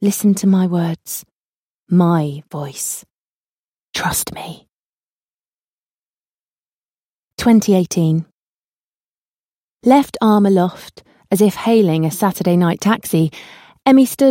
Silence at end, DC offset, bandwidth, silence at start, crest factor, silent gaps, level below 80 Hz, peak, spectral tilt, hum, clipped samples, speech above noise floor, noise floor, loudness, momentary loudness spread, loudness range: 0 s; under 0.1%; 16.5 kHz; 0 s; 16 dB; 1.32-1.87 s, 3.14-3.93 s, 4.74-5.42 s, 5.48-7.37 s, 8.32-9.76 s; -52 dBFS; -2 dBFS; -6 dB/octave; none; under 0.1%; over 75 dB; under -90 dBFS; -16 LUFS; 15 LU; 11 LU